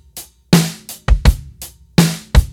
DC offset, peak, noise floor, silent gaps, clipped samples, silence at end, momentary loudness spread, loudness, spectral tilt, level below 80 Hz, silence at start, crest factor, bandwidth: under 0.1%; 0 dBFS; -38 dBFS; none; under 0.1%; 0 s; 19 LU; -16 LUFS; -5 dB/octave; -18 dBFS; 0.15 s; 16 dB; 17.5 kHz